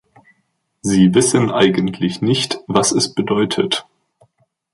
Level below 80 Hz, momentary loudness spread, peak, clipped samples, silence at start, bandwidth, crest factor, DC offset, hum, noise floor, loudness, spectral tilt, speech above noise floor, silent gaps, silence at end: -52 dBFS; 7 LU; -2 dBFS; under 0.1%; 0.85 s; 11.5 kHz; 16 dB; under 0.1%; none; -68 dBFS; -16 LUFS; -4.5 dB/octave; 52 dB; none; 0.95 s